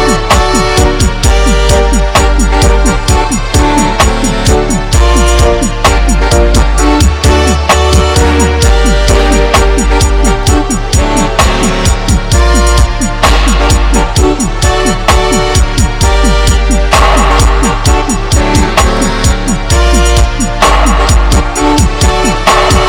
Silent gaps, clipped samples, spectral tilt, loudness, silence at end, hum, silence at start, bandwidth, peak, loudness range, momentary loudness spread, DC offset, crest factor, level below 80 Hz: none; 2%; -4.5 dB/octave; -9 LUFS; 0 s; none; 0 s; 16.5 kHz; 0 dBFS; 1 LU; 3 LU; under 0.1%; 8 dB; -10 dBFS